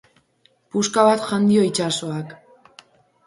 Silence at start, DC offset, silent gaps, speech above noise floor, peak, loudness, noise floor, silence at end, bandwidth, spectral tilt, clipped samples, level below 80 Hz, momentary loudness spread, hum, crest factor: 0.75 s; under 0.1%; none; 43 dB; -2 dBFS; -19 LUFS; -61 dBFS; 0.9 s; 11.5 kHz; -4.5 dB/octave; under 0.1%; -66 dBFS; 13 LU; none; 20 dB